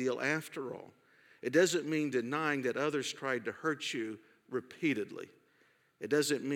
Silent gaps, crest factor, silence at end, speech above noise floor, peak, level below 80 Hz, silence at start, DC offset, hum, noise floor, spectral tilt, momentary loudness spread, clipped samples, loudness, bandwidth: none; 20 dB; 0 s; 36 dB; -14 dBFS; -90 dBFS; 0 s; under 0.1%; none; -70 dBFS; -4 dB/octave; 14 LU; under 0.1%; -34 LUFS; 17.5 kHz